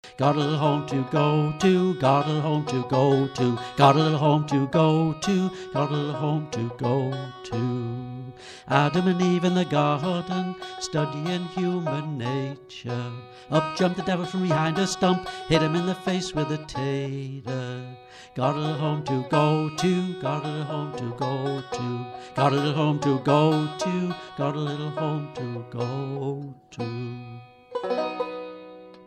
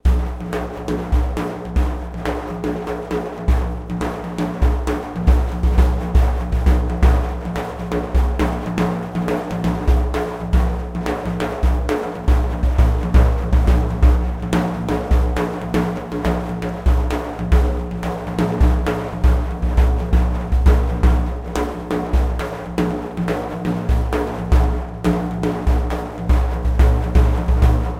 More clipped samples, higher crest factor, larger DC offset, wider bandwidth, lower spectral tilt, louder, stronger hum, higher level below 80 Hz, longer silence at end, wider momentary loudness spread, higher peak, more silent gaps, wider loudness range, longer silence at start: neither; first, 22 dB vs 16 dB; neither; about the same, 10.5 kHz vs 9.6 kHz; about the same, -6.5 dB/octave vs -7.5 dB/octave; second, -25 LUFS vs -20 LUFS; neither; second, -58 dBFS vs -18 dBFS; about the same, 0.05 s vs 0 s; first, 13 LU vs 8 LU; about the same, -2 dBFS vs -2 dBFS; neither; first, 7 LU vs 4 LU; about the same, 0.05 s vs 0.05 s